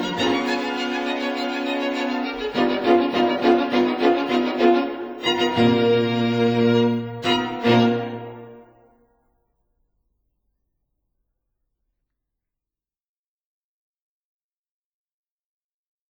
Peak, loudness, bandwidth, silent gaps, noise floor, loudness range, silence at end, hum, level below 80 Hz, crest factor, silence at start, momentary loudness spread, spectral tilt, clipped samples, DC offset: -4 dBFS; -20 LUFS; over 20 kHz; none; under -90 dBFS; 5 LU; 7.45 s; none; -60 dBFS; 18 dB; 0 s; 7 LU; -6 dB/octave; under 0.1%; under 0.1%